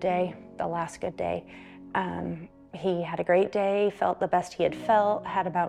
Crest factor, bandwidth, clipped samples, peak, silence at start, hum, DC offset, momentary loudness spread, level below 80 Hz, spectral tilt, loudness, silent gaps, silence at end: 16 dB; 11.5 kHz; under 0.1%; -10 dBFS; 0 s; none; under 0.1%; 12 LU; -60 dBFS; -6.5 dB/octave; -28 LUFS; none; 0 s